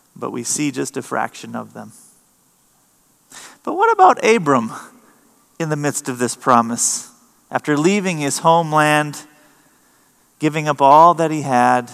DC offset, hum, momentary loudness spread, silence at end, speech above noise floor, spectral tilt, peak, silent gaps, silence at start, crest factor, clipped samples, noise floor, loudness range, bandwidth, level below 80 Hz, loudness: under 0.1%; none; 17 LU; 0 s; 41 dB; -4 dB/octave; 0 dBFS; none; 0.2 s; 18 dB; under 0.1%; -58 dBFS; 9 LU; 15 kHz; -72 dBFS; -16 LUFS